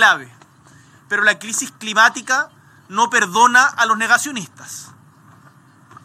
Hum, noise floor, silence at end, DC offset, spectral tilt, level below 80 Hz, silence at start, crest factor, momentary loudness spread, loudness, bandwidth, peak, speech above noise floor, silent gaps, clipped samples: none; -48 dBFS; 1.2 s; under 0.1%; -1 dB/octave; -74 dBFS; 0 s; 18 dB; 17 LU; -16 LUFS; 16.5 kHz; 0 dBFS; 32 dB; none; under 0.1%